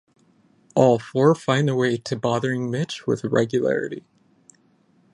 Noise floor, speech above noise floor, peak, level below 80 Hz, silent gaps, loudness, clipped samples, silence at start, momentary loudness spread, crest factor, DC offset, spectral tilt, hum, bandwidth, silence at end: -60 dBFS; 39 dB; -4 dBFS; -62 dBFS; none; -22 LUFS; under 0.1%; 0.75 s; 8 LU; 20 dB; under 0.1%; -6.5 dB/octave; none; 11 kHz; 1.15 s